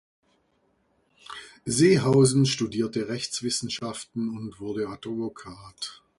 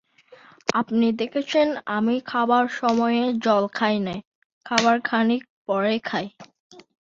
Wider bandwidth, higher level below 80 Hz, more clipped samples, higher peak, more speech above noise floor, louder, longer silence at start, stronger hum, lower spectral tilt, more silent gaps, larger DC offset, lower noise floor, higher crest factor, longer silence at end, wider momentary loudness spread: first, 11.5 kHz vs 7.6 kHz; first, -60 dBFS vs -66 dBFS; neither; second, -8 dBFS vs 0 dBFS; first, 44 dB vs 29 dB; second, -25 LUFS vs -22 LUFS; first, 1.3 s vs 0.3 s; neither; about the same, -5 dB/octave vs -4.5 dB/octave; second, none vs 4.27-4.61 s, 5.50-5.65 s, 6.60-6.70 s; neither; first, -69 dBFS vs -51 dBFS; about the same, 18 dB vs 22 dB; about the same, 0.25 s vs 0.2 s; first, 19 LU vs 8 LU